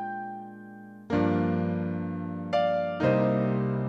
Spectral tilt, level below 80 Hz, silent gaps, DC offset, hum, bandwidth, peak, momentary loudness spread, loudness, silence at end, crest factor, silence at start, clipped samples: -9 dB/octave; -60 dBFS; none; under 0.1%; none; 7 kHz; -12 dBFS; 18 LU; -28 LUFS; 0 s; 16 dB; 0 s; under 0.1%